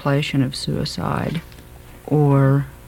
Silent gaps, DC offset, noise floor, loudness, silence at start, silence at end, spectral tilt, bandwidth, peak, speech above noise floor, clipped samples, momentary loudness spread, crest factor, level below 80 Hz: none; under 0.1%; -41 dBFS; -20 LUFS; 0 s; 0 s; -7 dB/octave; 15.5 kHz; -4 dBFS; 22 dB; under 0.1%; 11 LU; 16 dB; -42 dBFS